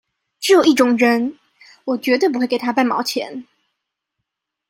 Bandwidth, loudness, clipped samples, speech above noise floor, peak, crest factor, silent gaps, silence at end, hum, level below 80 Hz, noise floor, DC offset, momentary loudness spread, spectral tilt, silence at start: 16.5 kHz; -17 LUFS; under 0.1%; 63 dB; -2 dBFS; 16 dB; none; 1.3 s; none; -68 dBFS; -79 dBFS; under 0.1%; 13 LU; -3 dB/octave; 0.4 s